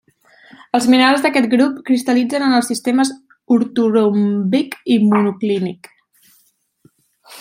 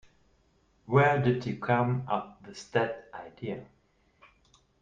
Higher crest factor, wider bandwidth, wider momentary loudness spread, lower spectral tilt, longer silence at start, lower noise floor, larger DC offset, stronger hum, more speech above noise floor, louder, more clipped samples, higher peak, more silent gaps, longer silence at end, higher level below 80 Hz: second, 16 dB vs 22 dB; first, 16 kHz vs 7.6 kHz; second, 7 LU vs 19 LU; second, -5 dB/octave vs -7.5 dB/octave; second, 0.75 s vs 0.9 s; second, -59 dBFS vs -68 dBFS; neither; neither; first, 44 dB vs 39 dB; first, -16 LUFS vs -29 LUFS; neither; first, -2 dBFS vs -10 dBFS; neither; second, 0 s vs 1.2 s; about the same, -66 dBFS vs -64 dBFS